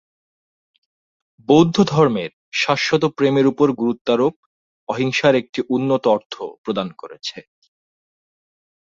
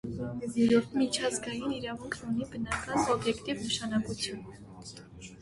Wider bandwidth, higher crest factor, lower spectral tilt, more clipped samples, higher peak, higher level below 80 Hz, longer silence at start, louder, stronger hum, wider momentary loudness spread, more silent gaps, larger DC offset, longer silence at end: second, 7.6 kHz vs 11.5 kHz; about the same, 18 dB vs 18 dB; first, -6 dB/octave vs -4 dB/octave; neither; first, -2 dBFS vs -14 dBFS; about the same, -58 dBFS vs -56 dBFS; first, 1.5 s vs 0.05 s; first, -18 LUFS vs -31 LUFS; neither; second, 15 LU vs 20 LU; first, 2.33-2.52 s, 4.01-4.05 s, 4.36-4.87 s, 5.49-5.53 s, 6.26-6.30 s, 6.58-6.64 s vs none; neither; first, 1.5 s vs 0 s